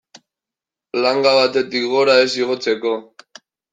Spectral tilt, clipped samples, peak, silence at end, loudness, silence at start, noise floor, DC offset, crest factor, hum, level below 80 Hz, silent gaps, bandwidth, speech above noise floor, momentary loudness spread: -3.5 dB/octave; under 0.1%; -2 dBFS; 0.7 s; -17 LUFS; 0.95 s; -87 dBFS; under 0.1%; 18 dB; none; -68 dBFS; none; 9.2 kHz; 71 dB; 9 LU